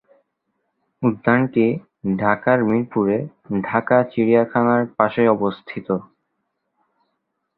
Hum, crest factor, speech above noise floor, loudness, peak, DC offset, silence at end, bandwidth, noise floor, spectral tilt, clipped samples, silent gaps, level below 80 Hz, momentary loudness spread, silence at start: none; 20 dB; 56 dB; -19 LUFS; 0 dBFS; under 0.1%; 1.55 s; 4.3 kHz; -74 dBFS; -11.5 dB/octave; under 0.1%; none; -58 dBFS; 9 LU; 1 s